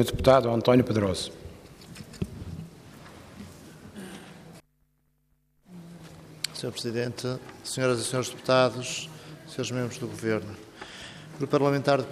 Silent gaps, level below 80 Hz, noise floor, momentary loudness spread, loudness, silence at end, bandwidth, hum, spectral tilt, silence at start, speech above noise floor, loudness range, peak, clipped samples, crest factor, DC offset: none; -52 dBFS; -70 dBFS; 25 LU; -27 LUFS; 0 s; 15.5 kHz; none; -5 dB/octave; 0 s; 44 dB; 18 LU; -6 dBFS; under 0.1%; 24 dB; under 0.1%